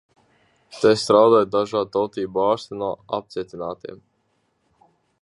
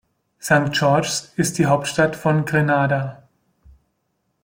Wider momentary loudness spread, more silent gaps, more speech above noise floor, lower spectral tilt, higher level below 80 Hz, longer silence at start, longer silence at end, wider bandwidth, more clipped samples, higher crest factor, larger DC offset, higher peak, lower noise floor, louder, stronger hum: first, 17 LU vs 6 LU; neither; second, 48 dB vs 53 dB; about the same, -5 dB/octave vs -5 dB/octave; second, -62 dBFS vs -54 dBFS; first, 0.75 s vs 0.45 s; about the same, 1.25 s vs 1.25 s; second, 11.5 kHz vs 16.5 kHz; neither; about the same, 20 dB vs 18 dB; neither; about the same, -2 dBFS vs -2 dBFS; about the same, -68 dBFS vs -71 dBFS; about the same, -21 LUFS vs -19 LUFS; neither